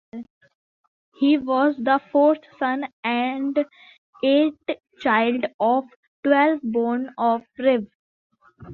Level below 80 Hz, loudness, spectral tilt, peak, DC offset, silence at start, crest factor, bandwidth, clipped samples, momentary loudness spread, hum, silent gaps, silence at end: -66 dBFS; -22 LUFS; -7.5 dB/octave; -4 dBFS; under 0.1%; 0.15 s; 18 dB; 4.4 kHz; under 0.1%; 8 LU; none; 0.30-0.41 s, 0.55-1.12 s, 2.93-3.03 s, 3.98-4.13 s, 5.54-5.59 s, 5.96-6.23 s, 7.95-8.30 s; 0 s